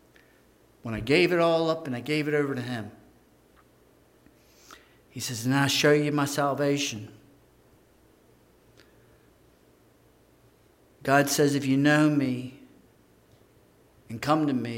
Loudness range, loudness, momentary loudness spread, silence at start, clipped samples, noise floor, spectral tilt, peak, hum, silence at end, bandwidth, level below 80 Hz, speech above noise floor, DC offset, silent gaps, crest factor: 8 LU; -25 LUFS; 15 LU; 0.85 s; under 0.1%; -60 dBFS; -5 dB/octave; -8 dBFS; 60 Hz at -60 dBFS; 0 s; 16 kHz; -62 dBFS; 35 dB; under 0.1%; none; 22 dB